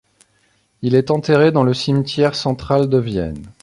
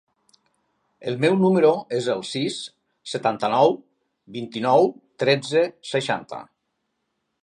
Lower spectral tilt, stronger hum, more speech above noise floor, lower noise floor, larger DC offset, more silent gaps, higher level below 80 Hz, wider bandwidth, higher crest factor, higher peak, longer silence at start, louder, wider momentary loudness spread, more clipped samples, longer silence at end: first, -7 dB/octave vs -5.5 dB/octave; neither; second, 44 dB vs 55 dB; second, -60 dBFS vs -76 dBFS; neither; neither; first, -44 dBFS vs -72 dBFS; about the same, 11.5 kHz vs 11 kHz; about the same, 16 dB vs 20 dB; about the same, -2 dBFS vs -4 dBFS; second, 0.8 s vs 1 s; first, -17 LUFS vs -22 LUFS; second, 9 LU vs 16 LU; neither; second, 0.1 s vs 1 s